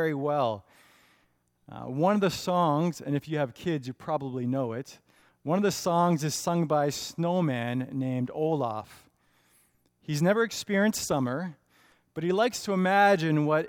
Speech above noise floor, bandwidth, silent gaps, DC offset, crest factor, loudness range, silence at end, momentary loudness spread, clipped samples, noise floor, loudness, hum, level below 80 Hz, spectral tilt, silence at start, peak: 43 dB; 17.5 kHz; none; under 0.1%; 20 dB; 4 LU; 0 s; 12 LU; under 0.1%; -70 dBFS; -28 LUFS; none; -66 dBFS; -5.5 dB/octave; 0 s; -8 dBFS